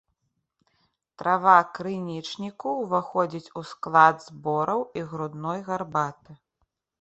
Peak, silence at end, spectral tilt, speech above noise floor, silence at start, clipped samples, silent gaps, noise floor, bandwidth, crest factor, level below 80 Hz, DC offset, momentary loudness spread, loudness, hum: -2 dBFS; 0.65 s; -6 dB/octave; 52 dB; 1.2 s; under 0.1%; none; -77 dBFS; 8.2 kHz; 24 dB; -70 dBFS; under 0.1%; 15 LU; -25 LUFS; none